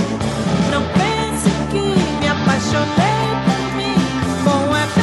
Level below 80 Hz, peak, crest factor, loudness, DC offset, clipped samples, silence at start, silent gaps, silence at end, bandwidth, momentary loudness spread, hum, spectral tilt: -36 dBFS; -2 dBFS; 14 dB; -17 LUFS; under 0.1%; under 0.1%; 0 s; none; 0 s; 12.5 kHz; 3 LU; none; -5.5 dB/octave